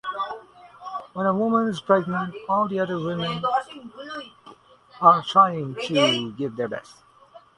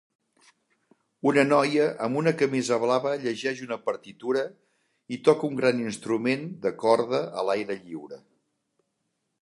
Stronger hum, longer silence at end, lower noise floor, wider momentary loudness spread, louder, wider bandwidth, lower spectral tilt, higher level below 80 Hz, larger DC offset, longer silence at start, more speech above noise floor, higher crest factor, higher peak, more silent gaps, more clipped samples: neither; second, 0.2 s vs 1.25 s; second, -51 dBFS vs -78 dBFS; first, 18 LU vs 12 LU; first, -22 LUFS vs -26 LUFS; about the same, 11.5 kHz vs 11.5 kHz; about the same, -5.5 dB/octave vs -5.5 dB/octave; first, -64 dBFS vs -74 dBFS; neither; second, 0.05 s vs 1.25 s; second, 29 dB vs 53 dB; about the same, 22 dB vs 22 dB; first, -2 dBFS vs -6 dBFS; neither; neither